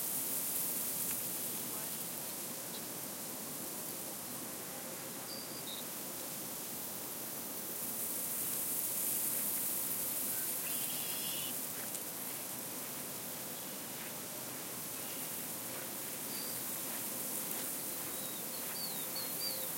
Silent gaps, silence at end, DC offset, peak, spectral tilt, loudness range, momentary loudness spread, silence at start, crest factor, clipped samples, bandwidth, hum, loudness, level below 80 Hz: none; 0 s; under 0.1%; -18 dBFS; -1.5 dB/octave; 7 LU; 7 LU; 0 s; 22 dB; under 0.1%; 16.5 kHz; none; -37 LUFS; -80 dBFS